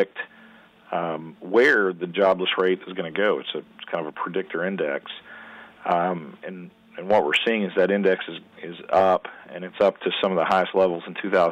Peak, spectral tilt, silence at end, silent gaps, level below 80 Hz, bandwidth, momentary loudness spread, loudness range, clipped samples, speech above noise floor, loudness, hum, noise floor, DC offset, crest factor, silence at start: -8 dBFS; -6 dB/octave; 0 s; none; -68 dBFS; 9.2 kHz; 18 LU; 6 LU; under 0.1%; 28 dB; -23 LUFS; none; -51 dBFS; under 0.1%; 14 dB; 0 s